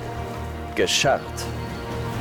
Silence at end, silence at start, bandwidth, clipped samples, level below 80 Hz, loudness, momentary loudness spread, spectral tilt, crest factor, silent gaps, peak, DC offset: 0 s; 0 s; 19.5 kHz; under 0.1%; -42 dBFS; -25 LUFS; 12 LU; -3.5 dB/octave; 16 dB; none; -10 dBFS; under 0.1%